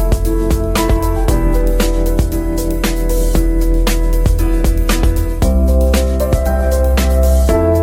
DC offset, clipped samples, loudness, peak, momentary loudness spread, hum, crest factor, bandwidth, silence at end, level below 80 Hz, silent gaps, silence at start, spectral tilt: under 0.1%; under 0.1%; -15 LUFS; 0 dBFS; 4 LU; none; 10 dB; 16.5 kHz; 0 s; -14 dBFS; none; 0 s; -6 dB/octave